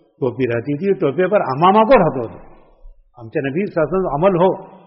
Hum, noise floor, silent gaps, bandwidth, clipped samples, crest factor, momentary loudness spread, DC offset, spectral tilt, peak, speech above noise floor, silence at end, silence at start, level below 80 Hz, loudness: none; -43 dBFS; none; 5.8 kHz; under 0.1%; 16 dB; 11 LU; under 0.1%; -6 dB/octave; -2 dBFS; 27 dB; 0.2 s; 0.2 s; -44 dBFS; -17 LUFS